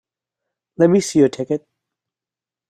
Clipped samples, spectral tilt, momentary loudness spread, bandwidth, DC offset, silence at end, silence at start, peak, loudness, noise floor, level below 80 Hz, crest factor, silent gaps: under 0.1%; -6 dB/octave; 10 LU; 13.5 kHz; under 0.1%; 1.15 s; 0.8 s; -2 dBFS; -17 LUFS; -90 dBFS; -62 dBFS; 18 dB; none